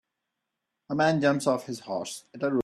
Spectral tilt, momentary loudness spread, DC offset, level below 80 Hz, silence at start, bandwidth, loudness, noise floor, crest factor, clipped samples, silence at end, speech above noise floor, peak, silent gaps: -5.5 dB/octave; 11 LU; under 0.1%; -70 dBFS; 0.9 s; 13.5 kHz; -27 LUFS; -84 dBFS; 18 dB; under 0.1%; 0 s; 57 dB; -10 dBFS; none